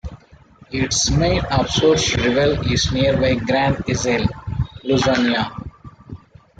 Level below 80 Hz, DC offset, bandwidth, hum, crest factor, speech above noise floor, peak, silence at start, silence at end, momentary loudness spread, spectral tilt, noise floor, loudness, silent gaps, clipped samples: -34 dBFS; under 0.1%; 9.4 kHz; none; 16 dB; 30 dB; -4 dBFS; 0.05 s; 0.45 s; 11 LU; -4.5 dB/octave; -47 dBFS; -18 LUFS; none; under 0.1%